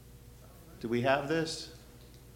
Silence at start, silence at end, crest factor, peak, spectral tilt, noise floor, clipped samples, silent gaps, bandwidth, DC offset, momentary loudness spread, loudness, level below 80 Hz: 0 s; 0 s; 22 dB; -12 dBFS; -5 dB/octave; -53 dBFS; under 0.1%; none; 16.5 kHz; under 0.1%; 25 LU; -32 LUFS; -58 dBFS